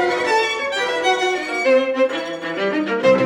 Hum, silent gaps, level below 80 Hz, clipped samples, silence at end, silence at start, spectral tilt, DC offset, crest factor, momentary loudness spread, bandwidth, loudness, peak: none; none; -62 dBFS; under 0.1%; 0 s; 0 s; -3.5 dB/octave; under 0.1%; 14 dB; 5 LU; 11.5 kHz; -19 LUFS; -4 dBFS